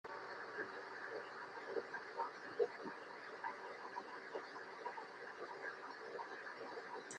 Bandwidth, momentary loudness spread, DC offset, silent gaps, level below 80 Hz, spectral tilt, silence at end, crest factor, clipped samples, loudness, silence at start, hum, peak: 11 kHz; 7 LU; under 0.1%; none; under -90 dBFS; -3 dB/octave; 0 s; 24 dB; under 0.1%; -48 LUFS; 0.05 s; none; -26 dBFS